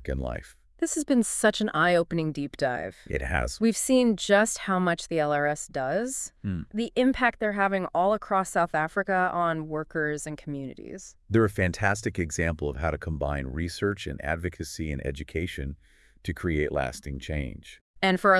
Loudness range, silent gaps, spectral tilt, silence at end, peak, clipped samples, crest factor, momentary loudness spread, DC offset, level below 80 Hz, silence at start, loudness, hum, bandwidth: 7 LU; 17.81-17.94 s; -5 dB/octave; 0 s; -6 dBFS; under 0.1%; 20 dB; 12 LU; under 0.1%; -44 dBFS; 0 s; -27 LUFS; none; 12 kHz